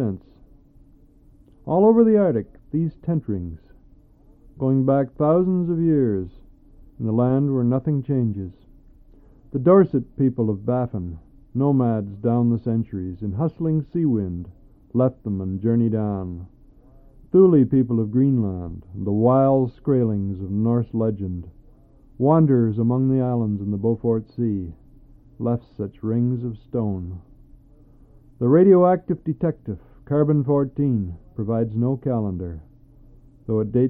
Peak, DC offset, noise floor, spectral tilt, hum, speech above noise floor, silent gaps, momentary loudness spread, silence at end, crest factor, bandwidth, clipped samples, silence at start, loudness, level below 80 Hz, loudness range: -4 dBFS; under 0.1%; -52 dBFS; -14 dB/octave; none; 32 dB; none; 15 LU; 0 s; 18 dB; 3.6 kHz; under 0.1%; 0 s; -21 LUFS; -48 dBFS; 5 LU